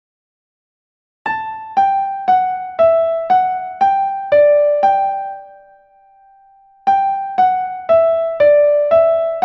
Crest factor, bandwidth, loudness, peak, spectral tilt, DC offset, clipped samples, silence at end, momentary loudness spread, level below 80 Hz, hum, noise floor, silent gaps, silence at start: 12 dB; 6 kHz; -15 LUFS; -2 dBFS; -5.5 dB/octave; under 0.1%; under 0.1%; 0 s; 10 LU; -58 dBFS; none; -49 dBFS; none; 1.25 s